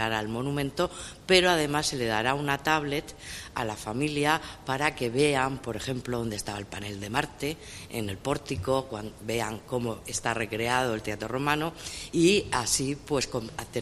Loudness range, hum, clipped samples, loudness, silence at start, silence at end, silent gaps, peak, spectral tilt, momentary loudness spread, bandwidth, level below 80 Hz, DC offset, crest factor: 6 LU; none; under 0.1%; -28 LUFS; 0 s; 0 s; none; -6 dBFS; -4 dB/octave; 11 LU; 15.5 kHz; -50 dBFS; under 0.1%; 22 dB